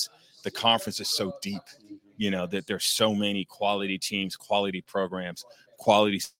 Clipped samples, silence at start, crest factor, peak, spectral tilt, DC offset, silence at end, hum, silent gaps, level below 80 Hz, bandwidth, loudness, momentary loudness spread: under 0.1%; 0 s; 24 dB; -4 dBFS; -3.5 dB/octave; under 0.1%; 0.1 s; none; none; -70 dBFS; 17 kHz; -27 LUFS; 13 LU